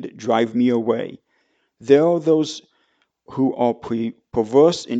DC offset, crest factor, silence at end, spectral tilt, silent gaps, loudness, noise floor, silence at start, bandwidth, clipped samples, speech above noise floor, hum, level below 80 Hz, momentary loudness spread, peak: under 0.1%; 18 dB; 0 s; -6 dB/octave; none; -19 LUFS; -66 dBFS; 0 s; 8.2 kHz; under 0.1%; 48 dB; none; -60 dBFS; 13 LU; -2 dBFS